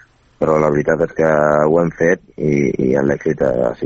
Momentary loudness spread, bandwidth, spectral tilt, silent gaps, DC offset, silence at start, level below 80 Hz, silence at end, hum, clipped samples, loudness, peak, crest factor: 4 LU; 7.6 kHz; -8 dB/octave; none; under 0.1%; 0.4 s; -42 dBFS; 0 s; none; under 0.1%; -16 LUFS; 0 dBFS; 14 dB